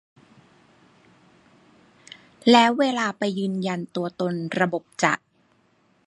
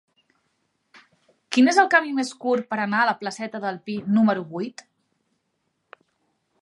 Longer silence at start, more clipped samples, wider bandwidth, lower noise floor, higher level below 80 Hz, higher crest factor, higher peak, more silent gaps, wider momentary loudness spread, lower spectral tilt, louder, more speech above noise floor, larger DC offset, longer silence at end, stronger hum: first, 2.45 s vs 1.5 s; neither; about the same, 11.5 kHz vs 11.5 kHz; second, -63 dBFS vs -74 dBFS; about the same, -74 dBFS vs -76 dBFS; about the same, 22 dB vs 22 dB; about the same, -2 dBFS vs -2 dBFS; neither; about the same, 12 LU vs 13 LU; about the same, -5 dB/octave vs -4.5 dB/octave; about the same, -22 LUFS vs -22 LUFS; second, 41 dB vs 53 dB; neither; second, 0.9 s vs 1.9 s; neither